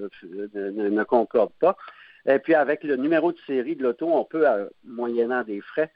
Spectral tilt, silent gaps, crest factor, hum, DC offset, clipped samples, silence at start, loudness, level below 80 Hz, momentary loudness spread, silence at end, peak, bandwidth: -9.5 dB/octave; none; 18 dB; none; under 0.1%; under 0.1%; 0 s; -24 LUFS; -74 dBFS; 11 LU; 0.1 s; -6 dBFS; 5.2 kHz